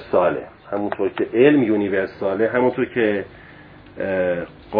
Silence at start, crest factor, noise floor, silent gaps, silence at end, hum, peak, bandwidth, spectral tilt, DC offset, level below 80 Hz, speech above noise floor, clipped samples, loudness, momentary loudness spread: 0 s; 18 dB; -43 dBFS; none; 0 s; none; -2 dBFS; 5 kHz; -10 dB/octave; under 0.1%; -54 dBFS; 24 dB; under 0.1%; -20 LUFS; 13 LU